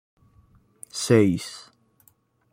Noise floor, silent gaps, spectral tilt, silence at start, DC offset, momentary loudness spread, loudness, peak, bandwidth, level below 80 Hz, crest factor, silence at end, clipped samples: -63 dBFS; none; -5.5 dB/octave; 0.95 s; under 0.1%; 19 LU; -22 LUFS; -6 dBFS; 16.5 kHz; -62 dBFS; 22 dB; 0.95 s; under 0.1%